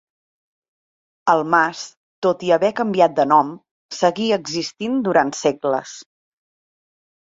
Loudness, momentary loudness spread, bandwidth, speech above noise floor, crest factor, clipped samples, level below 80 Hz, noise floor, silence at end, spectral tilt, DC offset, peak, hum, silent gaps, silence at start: -19 LUFS; 12 LU; 8 kHz; over 72 dB; 20 dB; under 0.1%; -66 dBFS; under -90 dBFS; 1.4 s; -4.5 dB/octave; under 0.1%; -2 dBFS; none; 1.97-2.22 s, 3.71-3.89 s; 1.25 s